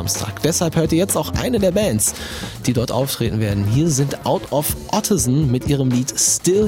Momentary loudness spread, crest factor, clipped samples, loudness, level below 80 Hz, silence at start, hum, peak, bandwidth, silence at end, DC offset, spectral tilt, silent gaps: 5 LU; 16 dB; under 0.1%; -18 LUFS; -38 dBFS; 0 s; none; -2 dBFS; 16.5 kHz; 0 s; under 0.1%; -4.5 dB/octave; none